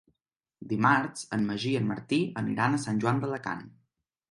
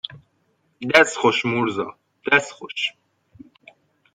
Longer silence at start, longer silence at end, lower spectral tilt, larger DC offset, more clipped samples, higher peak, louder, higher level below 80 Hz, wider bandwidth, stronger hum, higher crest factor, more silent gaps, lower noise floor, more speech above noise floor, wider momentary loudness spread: first, 0.6 s vs 0.1 s; second, 0.6 s vs 1.25 s; first, -6 dB/octave vs -3.5 dB/octave; neither; neither; second, -8 dBFS vs 0 dBFS; second, -29 LUFS vs -20 LUFS; about the same, -66 dBFS vs -64 dBFS; second, 11.5 kHz vs 13.5 kHz; neither; about the same, 22 dB vs 22 dB; neither; first, -86 dBFS vs -67 dBFS; first, 58 dB vs 47 dB; second, 10 LU vs 17 LU